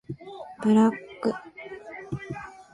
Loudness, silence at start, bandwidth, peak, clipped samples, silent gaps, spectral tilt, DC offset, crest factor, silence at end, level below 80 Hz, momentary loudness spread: -26 LUFS; 0.1 s; 11 kHz; -10 dBFS; under 0.1%; none; -7.5 dB/octave; under 0.1%; 18 dB; 0.1 s; -60 dBFS; 20 LU